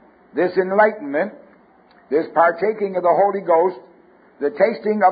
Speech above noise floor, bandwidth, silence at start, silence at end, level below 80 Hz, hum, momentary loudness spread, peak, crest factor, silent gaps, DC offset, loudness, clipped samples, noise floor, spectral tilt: 34 dB; 5 kHz; 0.35 s; 0 s; -70 dBFS; none; 9 LU; -2 dBFS; 18 dB; none; under 0.1%; -19 LUFS; under 0.1%; -52 dBFS; -11 dB/octave